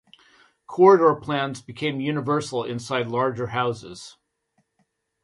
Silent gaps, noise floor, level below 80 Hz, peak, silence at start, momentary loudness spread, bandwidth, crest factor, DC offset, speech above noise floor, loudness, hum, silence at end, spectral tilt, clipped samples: none; -71 dBFS; -64 dBFS; -2 dBFS; 0.7 s; 17 LU; 11.5 kHz; 22 dB; under 0.1%; 49 dB; -22 LUFS; none; 1.15 s; -6 dB/octave; under 0.1%